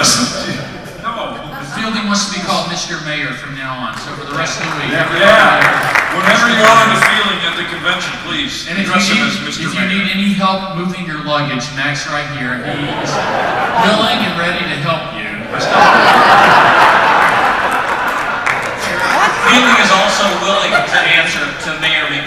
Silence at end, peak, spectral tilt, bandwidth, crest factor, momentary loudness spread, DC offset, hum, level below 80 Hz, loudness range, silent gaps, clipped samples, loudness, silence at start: 0 s; 0 dBFS; -3 dB/octave; 18.5 kHz; 12 dB; 14 LU; under 0.1%; none; -44 dBFS; 8 LU; none; 0.2%; -12 LUFS; 0 s